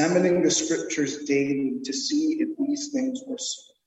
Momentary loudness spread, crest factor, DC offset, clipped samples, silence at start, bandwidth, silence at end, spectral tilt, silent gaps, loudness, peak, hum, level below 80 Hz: 9 LU; 16 dB; under 0.1%; under 0.1%; 0 s; 8.6 kHz; 0.25 s; -3.5 dB/octave; none; -25 LUFS; -10 dBFS; none; -68 dBFS